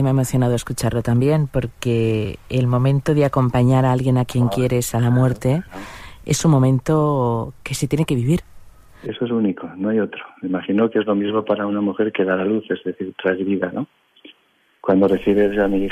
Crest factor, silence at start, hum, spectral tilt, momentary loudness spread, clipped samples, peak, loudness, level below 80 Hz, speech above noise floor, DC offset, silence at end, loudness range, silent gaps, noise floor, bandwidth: 14 dB; 0 s; none; -7 dB/octave; 10 LU; under 0.1%; -6 dBFS; -19 LUFS; -44 dBFS; 42 dB; under 0.1%; 0 s; 4 LU; none; -60 dBFS; 15.5 kHz